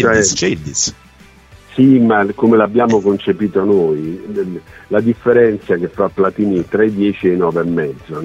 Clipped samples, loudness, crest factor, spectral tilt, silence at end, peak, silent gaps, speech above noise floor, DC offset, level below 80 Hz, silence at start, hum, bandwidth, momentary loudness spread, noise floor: under 0.1%; -14 LUFS; 14 dB; -5 dB/octave; 0 s; 0 dBFS; none; 29 dB; under 0.1%; -46 dBFS; 0 s; none; 8.4 kHz; 10 LU; -43 dBFS